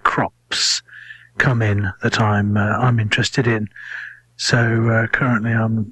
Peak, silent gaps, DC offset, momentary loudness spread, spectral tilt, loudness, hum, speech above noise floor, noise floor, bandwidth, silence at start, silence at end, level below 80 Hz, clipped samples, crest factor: 0 dBFS; none; under 0.1%; 14 LU; -5 dB/octave; -18 LUFS; 60 Hz at -35 dBFS; 23 dB; -40 dBFS; 11.5 kHz; 0.05 s; 0 s; -44 dBFS; under 0.1%; 18 dB